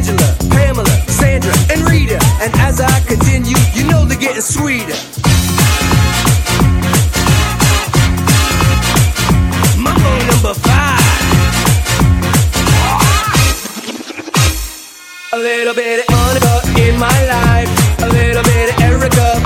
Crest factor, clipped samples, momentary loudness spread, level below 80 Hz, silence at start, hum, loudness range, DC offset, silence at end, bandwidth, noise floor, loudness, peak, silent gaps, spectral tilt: 10 dB; under 0.1%; 4 LU; -18 dBFS; 0 s; none; 3 LU; under 0.1%; 0 s; 18 kHz; -31 dBFS; -11 LUFS; 0 dBFS; none; -4.5 dB/octave